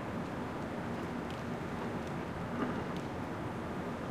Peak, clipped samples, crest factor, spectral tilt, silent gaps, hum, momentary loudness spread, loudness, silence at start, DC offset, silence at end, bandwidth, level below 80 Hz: -22 dBFS; under 0.1%; 16 dB; -6.5 dB/octave; none; none; 3 LU; -39 LUFS; 0 s; under 0.1%; 0 s; 15.5 kHz; -56 dBFS